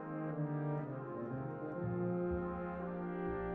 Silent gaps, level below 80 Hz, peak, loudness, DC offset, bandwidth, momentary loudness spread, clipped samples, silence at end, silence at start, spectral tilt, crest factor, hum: none; -58 dBFS; -28 dBFS; -41 LUFS; under 0.1%; 3.8 kHz; 5 LU; under 0.1%; 0 s; 0 s; -9.5 dB/octave; 12 dB; none